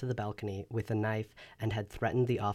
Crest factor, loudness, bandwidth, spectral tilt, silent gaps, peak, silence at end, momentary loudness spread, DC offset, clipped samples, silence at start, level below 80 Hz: 14 dB; -35 LUFS; 13.5 kHz; -7.5 dB/octave; none; -20 dBFS; 0 s; 8 LU; under 0.1%; under 0.1%; 0 s; -58 dBFS